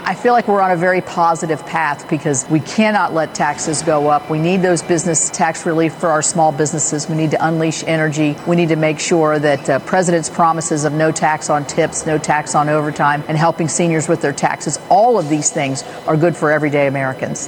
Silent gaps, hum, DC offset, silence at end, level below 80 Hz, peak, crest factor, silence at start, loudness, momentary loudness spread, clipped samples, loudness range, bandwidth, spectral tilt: none; none; under 0.1%; 0 s; -54 dBFS; 0 dBFS; 16 dB; 0 s; -15 LUFS; 4 LU; under 0.1%; 1 LU; 16.5 kHz; -4.5 dB/octave